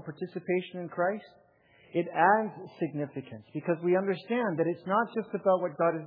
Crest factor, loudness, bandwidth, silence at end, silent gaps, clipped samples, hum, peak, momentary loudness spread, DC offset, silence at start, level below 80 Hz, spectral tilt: 20 dB; -30 LUFS; 5 kHz; 0 s; none; under 0.1%; none; -10 dBFS; 13 LU; under 0.1%; 0 s; -82 dBFS; -10.5 dB/octave